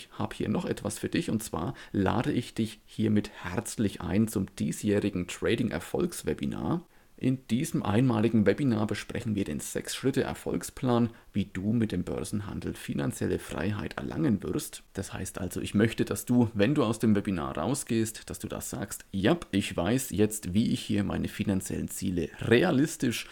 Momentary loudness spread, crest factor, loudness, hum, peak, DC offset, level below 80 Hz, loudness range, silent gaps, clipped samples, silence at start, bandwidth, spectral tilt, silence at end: 9 LU; 22 dB; -30 LUFS; none; -8 dBFS; under 0.1%; -52 dBFS; 3 LU; none; under 0.1%; 0 s; 18 kHz; -5.5 dB/octave; 0 s